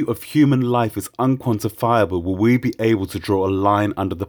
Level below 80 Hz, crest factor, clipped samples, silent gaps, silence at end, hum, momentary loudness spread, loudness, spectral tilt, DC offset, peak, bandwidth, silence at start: -50 dBFS; 16 dB; under 0.1%; none; 0 s; none; 5 LU; -19 LUFS; -7 dB/octave; under 0.1%; -2 dBFS; over 20 kHz; 0 s